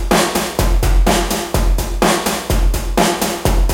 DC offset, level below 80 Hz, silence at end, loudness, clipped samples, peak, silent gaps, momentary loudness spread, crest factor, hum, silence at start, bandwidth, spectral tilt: under 0.1%; -18 dBFS; 0 s; -16 LUFS; under 0.1%; 0 dBFS; none; 3 LU; 14 dB; none; 0 s; 17 kHz; -4 dB/octave